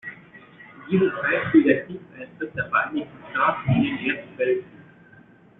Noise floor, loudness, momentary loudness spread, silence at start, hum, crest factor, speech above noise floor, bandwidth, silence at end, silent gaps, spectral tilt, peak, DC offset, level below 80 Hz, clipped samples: -51 dBFS; -23 LUFS; 19 LU; 0.05 s; none; 20 dB; 28 dB; 4 kHz; 0.95 s; none; -5.5 dB/octave; -4 dBFS; under 0.1%; -56 dBFS; under 0.1%